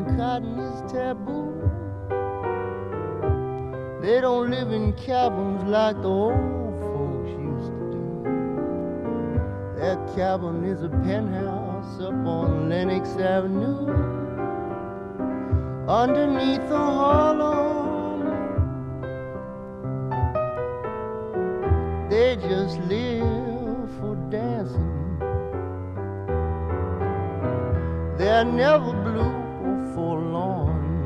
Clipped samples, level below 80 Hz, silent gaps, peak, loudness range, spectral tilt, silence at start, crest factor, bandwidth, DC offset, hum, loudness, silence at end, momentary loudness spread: under 0.1%; -38 dBFS; none; -6 dBFS; 6 LU; -8.5 dB/octave; 0 s; 18 dB; 7.6 kHz; under 0.1%; none; -25 LUFS; 0 s; 10 LU